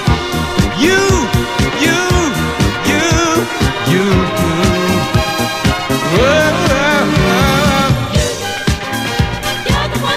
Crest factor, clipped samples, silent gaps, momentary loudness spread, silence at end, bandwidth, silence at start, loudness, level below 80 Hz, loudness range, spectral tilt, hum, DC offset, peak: 12 dB; under 0.1%; none; 5 LU; 0 s; 15.5 kHz; 0 s; -13 LUFS; -24 dBFS; 1 LU; -4.5 dB/octave; none; under 0.1%; 0 dBFS